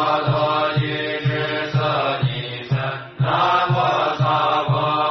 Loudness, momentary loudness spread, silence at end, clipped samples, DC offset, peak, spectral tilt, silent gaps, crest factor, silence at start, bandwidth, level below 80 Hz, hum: -20 LUFS; 6 LU; 0 s; under 0.1%; under 0.1%; -6 dBFS; -4 dB/octave; none; 14 dB; 0 s; 6.2 kHz; -56 dBFS; none